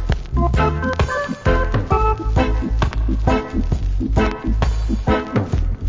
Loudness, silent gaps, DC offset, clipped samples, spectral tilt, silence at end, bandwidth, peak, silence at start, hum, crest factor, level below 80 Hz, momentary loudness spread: -20 LUFS; none; under 0.1%; under 0.1%; -7.5 dB/octave; 0 s; 7.6 kHz; -2 dBFS; 0 s; none; 16 dB; -20 dBFS; 4 LU